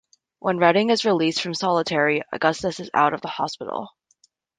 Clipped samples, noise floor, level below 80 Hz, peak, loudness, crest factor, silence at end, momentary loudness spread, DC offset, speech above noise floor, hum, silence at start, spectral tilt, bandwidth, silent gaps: under 0.1%; -63 dBFS; -64 dBFS; -2 dBFS; -22 LUFS; 20 dB; 0.7 s; 11 LU; under 0.1%; 42 dB; none; 0.45 s; -4.5 dB/octave; 9.6 kHz; none